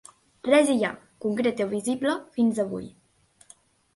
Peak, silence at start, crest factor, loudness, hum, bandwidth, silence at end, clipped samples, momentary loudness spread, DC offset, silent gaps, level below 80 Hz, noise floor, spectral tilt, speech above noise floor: -6 dBFS; 0.45 s; 20 dB; -25 LUFS; none; 11.5 kHz; 1.05 s; under 0.1%; 13 LU; under 0.1%; none; -66 dBFS; -61 dBFS; -4.5 dB/octave; 37 dB